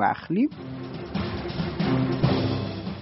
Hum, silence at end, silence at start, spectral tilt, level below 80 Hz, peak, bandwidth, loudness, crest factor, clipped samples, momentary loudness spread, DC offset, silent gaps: none; 0 s; 0 s; -6 dB/octave; -46 dBFS; -8 dBFS; 6 kHz; -27 LUFS; 18 dB; under 0.1%; 10 LU; under 0.1%; none